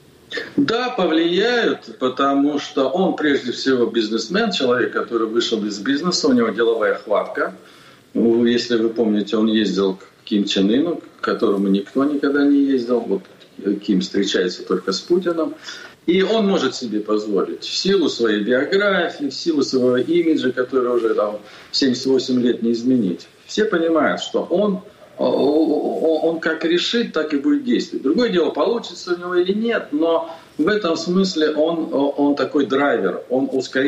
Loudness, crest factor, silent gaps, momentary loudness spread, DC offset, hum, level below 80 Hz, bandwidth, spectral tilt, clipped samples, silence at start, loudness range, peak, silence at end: -19 LUFS; 12 dB; none; 7 LU; under 0.1%; none; -62 dBFS; 9.2 kHz; -5 dB/octave; under 0.1%; 0.3 s; 1 LU; -8 dBFS; 0 s